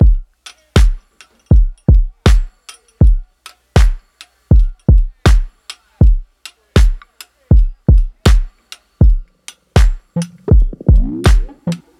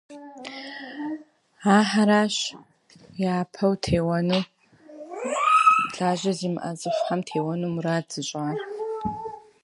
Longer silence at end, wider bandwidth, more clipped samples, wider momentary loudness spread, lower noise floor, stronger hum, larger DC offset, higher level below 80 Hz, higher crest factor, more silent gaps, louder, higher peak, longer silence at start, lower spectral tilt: about the same, 0.25 s vs 0.25 s; about the same, 11.5 kHz vs 11.5 kHz; neither; second, 11 LU vs 18 LU; about the same, -48 dBFS vs -45 dBFS; neither; neither; first, -14 dBFS vs -54 dBFS; second, 12 dB vs 20 dB; neither; first, -15 LUFS vs -24 LUFS; first, 0 dBFS vs -4 dBFS; about the same, 0 s vs 0.1 s; first, -6.5 dB/octave vs -5 dB/octave